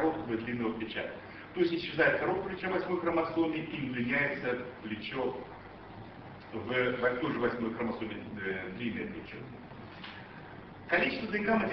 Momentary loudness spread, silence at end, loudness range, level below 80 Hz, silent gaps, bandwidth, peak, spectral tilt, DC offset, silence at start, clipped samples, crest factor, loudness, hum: 18 LU; 0 s; 5 LU; -62 dBFS; none; 6 kHz; -14 dBFS; -8 dB/octave; under 0.1%; 0 s; under 0.1%; 20 dB; -33 LUFS; none